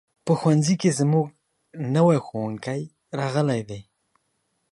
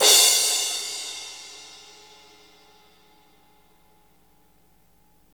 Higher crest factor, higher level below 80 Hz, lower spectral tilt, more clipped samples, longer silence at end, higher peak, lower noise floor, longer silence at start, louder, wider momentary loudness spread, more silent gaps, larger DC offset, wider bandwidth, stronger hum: about the same, 18 dB vs 22 dB; first, -64 dBFS vs -72 dBFS; first, -6.5 dB/octave vs 3 dB/octave; neither; second, 0.9 s vs 3.7 s; about the same, -6 dBFS vs -4 dBFS; first, -73 dBFS vs -61 dBFS; first, 0.25 s vs 0 s; second, -23 LUFS vs -19 LUFS; second, 13 LU vs 29 LU; neither; neither; second, 11.5 kHz vs over 20 kHz; second, none vs 50 Hz at -75 dBFS